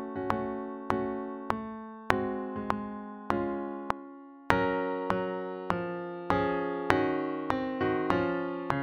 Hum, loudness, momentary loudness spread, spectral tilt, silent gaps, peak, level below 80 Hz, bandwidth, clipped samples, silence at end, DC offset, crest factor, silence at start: none; -32 LUFS; 9 LU; -7 dB/octave; none; 0 dBFS; -54 dBFS; 8.4 kHz; under 0.1%; 0 s; under 0.1%; 30 dB; 0 s